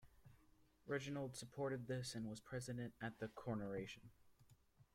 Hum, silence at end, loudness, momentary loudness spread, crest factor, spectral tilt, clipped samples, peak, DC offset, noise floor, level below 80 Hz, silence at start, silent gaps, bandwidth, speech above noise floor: none; 0.1 s; -48 LUFS; 5 LU; 20 dB; -5.5 dB/octave; under 0.1%; -30 dBFS; under 0.1%; -73 dBFS; -74 dBFS; 0 s; none; 16.5 kHz; 25 dB